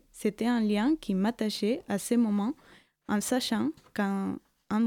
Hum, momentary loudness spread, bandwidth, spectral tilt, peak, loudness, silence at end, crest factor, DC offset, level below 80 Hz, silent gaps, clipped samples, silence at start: none; 8 LU; 18 kHz; -5 dB/octave; -14 dBFS; -29 LUFS; 0 s; 14 dB; under 0.1%; -64 dBFS; none; under 0.1%; 0.15 s